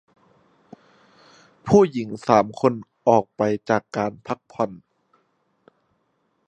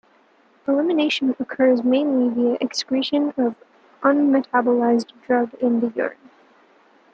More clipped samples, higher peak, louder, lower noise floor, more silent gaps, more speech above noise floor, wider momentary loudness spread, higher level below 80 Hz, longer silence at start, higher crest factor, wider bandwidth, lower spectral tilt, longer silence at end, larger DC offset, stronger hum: neither; first, 0 dBFS vs -4 dBFS; about the same, -22 LUFS vs -20 LUFS; first, -69 dBFS vs -57 dBFS; neither; first, 49 dB vs 37 dB; first, 11 LU vs 6 LU; first, -60 dBFS vs -70 dBFS; first, 1.65 s vs 0.65 s; first, 24 dB vs 18 dB; first, 8.8 kHz vs 7.8 kHz; first, -7 dB/octave vs -4.5 dB/octave; first, 1.7 s vs 1 s; neither; neither